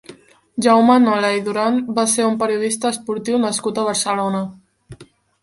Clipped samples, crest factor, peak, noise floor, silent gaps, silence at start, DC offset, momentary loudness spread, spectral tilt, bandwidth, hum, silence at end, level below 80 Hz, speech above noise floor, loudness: under 0.1%; 16 dB; -2 dBFS; -44 dBFS; none; 0.1 s; under 0.1%; 9 LU; -4 dB/octave; 11.5 kHz; none; 0.4 s; -60 dBFS; 27 dB; -17 LUFS